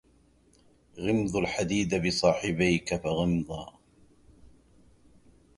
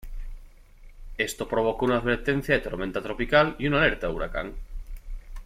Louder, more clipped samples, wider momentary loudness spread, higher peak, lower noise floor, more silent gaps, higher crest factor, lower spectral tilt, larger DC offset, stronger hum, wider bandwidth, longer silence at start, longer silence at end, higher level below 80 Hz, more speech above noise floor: second, -28 LUFS vs -25 LUFS; neither; second, 10 LU vs 22 LU; about the same, -8 dBFS vs -6 dBFS; first, -63 dBFS vs -48 dBFS; neither; about the same, 22 dB vs 20 dB; about the same, -5 dB/octave vs -5.5 dB/octave; neither; neither; second, 11.5 kHz vs 15.5 kHz; first, 0.95 s vs 0.05 s; first, 1.9 s vs 0 s; second, -52 dBFS vs -38 dBFS; first, 35 dB vs 23 dB